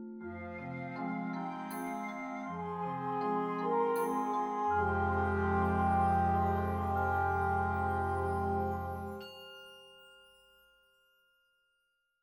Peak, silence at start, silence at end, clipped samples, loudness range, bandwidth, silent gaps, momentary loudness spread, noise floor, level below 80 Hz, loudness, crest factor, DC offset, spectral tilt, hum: -20 dBFS; 0 s; 2.1 s; under 0.1%; 9 LU; 19.5 kHz; none; 13 LU; -80 dBFS; -52 dBFS; -34 LUFS; 14 dB; under 0.1%; -7.5 dB/octave; none